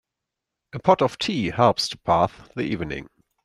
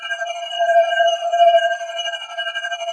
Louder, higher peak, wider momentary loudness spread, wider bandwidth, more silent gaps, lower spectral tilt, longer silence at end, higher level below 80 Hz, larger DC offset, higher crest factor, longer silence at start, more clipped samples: second, -22 LUFS vs -18 LUFS; about the same, -2 dBFS vs -4 dBFS; about the same, 12 LU vs 11 LU; first, 14 kHz vs 10.5 kHz; neither; first, -5.5 dB/octave vs 4 dB/octave; first, 0.4 s vs 0 s; first, -52 dBFS vs -84 dBFS; neither; first, 22 dB vs 14 dB; first, 0.75 s vs 0 s; neither